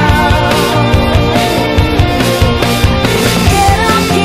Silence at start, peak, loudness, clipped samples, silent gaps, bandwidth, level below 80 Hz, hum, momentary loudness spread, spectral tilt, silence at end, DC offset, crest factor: 0 s; 0 dBFS; -10 LUFS; under 0.1%; none; 16 kHz; -18 dBFS; none; 2 LU; -5 dB/octave; 0 s; under 0.1%; 10 dB